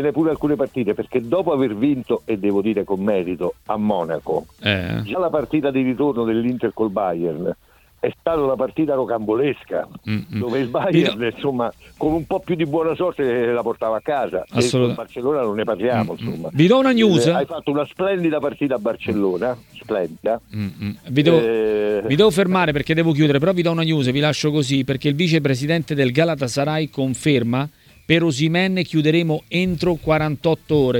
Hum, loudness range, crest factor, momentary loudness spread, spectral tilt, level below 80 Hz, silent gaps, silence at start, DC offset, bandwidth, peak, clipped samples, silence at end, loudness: none; 4 LU; 20 dB; 8 LU; -6.5 dB/octave; -50 dBFS; none; 0 s; under 0.1%; 18 kHz; 0 dBFS; under 0.1%; 0 s; -20 LUFS